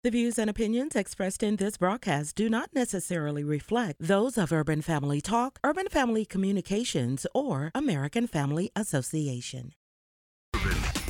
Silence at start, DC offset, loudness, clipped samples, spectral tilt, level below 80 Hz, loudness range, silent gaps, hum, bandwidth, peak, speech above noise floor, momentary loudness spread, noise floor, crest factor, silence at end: 0.05 s; under 0.1%; -29 LUFS; under 0.1%; -5.5 dB/octave; -44 dBFS; 3 LU; 9.76-10.52 s; none; 17.5 kHz; -10 dBFS; over 62 dB; 4 LU; under -90 dBFS; 18 dB; 0 s